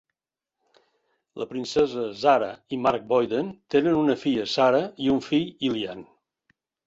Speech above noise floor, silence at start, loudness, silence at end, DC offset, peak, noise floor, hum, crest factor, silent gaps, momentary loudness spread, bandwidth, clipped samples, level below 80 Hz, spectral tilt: 64 dB; 1.35 s; -24 LUFS; 0.85 s; under 0.1%; -8 dBFS; -88 dBFS; none; 18 dB; none; 11 LU; 8 kHz; under 0.1%; -62 dBFS; -5.5 dB/octave